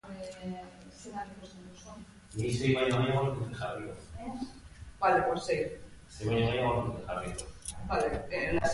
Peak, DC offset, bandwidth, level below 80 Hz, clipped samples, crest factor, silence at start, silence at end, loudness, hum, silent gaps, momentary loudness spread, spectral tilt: -14 dBFS; under 0.1%; 11.5 kHz; -50 dBFS; under 0.1%; 18 dB; 0.05 s; 0 s; -32 LUFS; none; none; 21 LU; -5.5 dB/octave